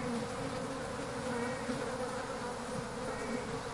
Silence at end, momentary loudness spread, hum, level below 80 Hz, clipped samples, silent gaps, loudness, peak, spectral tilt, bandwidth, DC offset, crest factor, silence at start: 0 s; 3 LU; none; -56 dBFS; under 0.1%; none; -38 LUFS; -24 dBFS; -4.5 dB/octave; 11.5 kHz; under 0.1%; 14 dB; 0 s